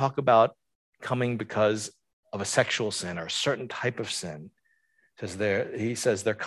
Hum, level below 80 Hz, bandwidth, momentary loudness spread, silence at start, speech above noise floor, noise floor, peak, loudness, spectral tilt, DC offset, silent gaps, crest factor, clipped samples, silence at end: none; -62 dBFS; 12.5 kHz; 17 LU; 0 s; 42 dB; -70 dBFS; -8 dBFS; -27 LUFS; -4 dB/octave; under 0.1%; 0.75-0.93 s, 2.13-2.23 s; 22 dB; under 0.1%; 0 s